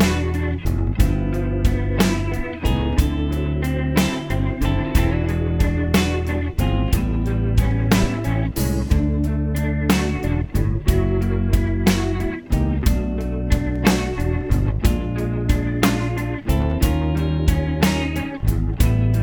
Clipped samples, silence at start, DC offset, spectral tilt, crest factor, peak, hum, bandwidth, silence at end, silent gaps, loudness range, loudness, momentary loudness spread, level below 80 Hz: under 0.1%; 0 s; under 0.1%; -6.5 dB/octave; 18 dB; -2 dBFS; none; over 20 kHz; 0 s; none; 1 LU; -21 LUFS; 4 LU; -24 dBFS